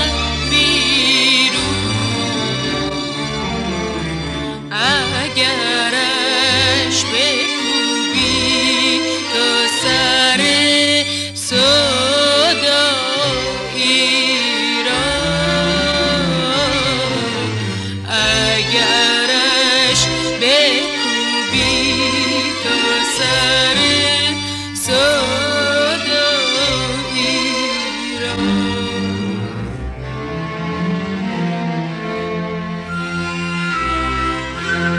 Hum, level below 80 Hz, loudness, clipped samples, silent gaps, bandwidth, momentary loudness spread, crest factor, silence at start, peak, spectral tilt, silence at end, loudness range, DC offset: none; -36 dBFS; -14 LUFS; under 0.1%; none; 14.5 kHz; 10 LU; 14 dB; 0 s; -2 dBFS; -3 dB/octave; 0 s; 8 LU; under 0.1%